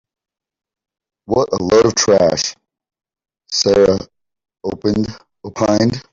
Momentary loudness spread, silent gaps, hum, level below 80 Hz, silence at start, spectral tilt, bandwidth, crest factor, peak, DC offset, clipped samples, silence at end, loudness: 14 LU; none; none; -48 dBFS; 1.3 s; -4.5 dB/octave; 7.8 kHz; 16 dB; -2 dBFS; under 0.1%; under 0.1%; 0.1 s; -15 LUFS